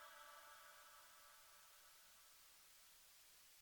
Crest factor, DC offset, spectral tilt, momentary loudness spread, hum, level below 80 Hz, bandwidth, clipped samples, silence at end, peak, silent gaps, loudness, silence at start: 16 dB; under 0.1%; 1 dB/octave; 4 LU; none; under -90 dBFS; over 20 kHz; under 0.1%; 0 s; -50 dBFS; none; -63 LUFS; 0 s